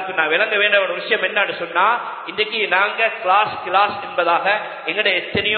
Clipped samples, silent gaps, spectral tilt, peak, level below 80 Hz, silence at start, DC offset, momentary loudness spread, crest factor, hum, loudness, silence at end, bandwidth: under 0.1%; none; -8 dB/octave; 0 dBFS; -58 dBFS; 0 s; under 0.1%; 5 LU; 18 dB; none; -18 LUFS; 0 s; 4.6 kHz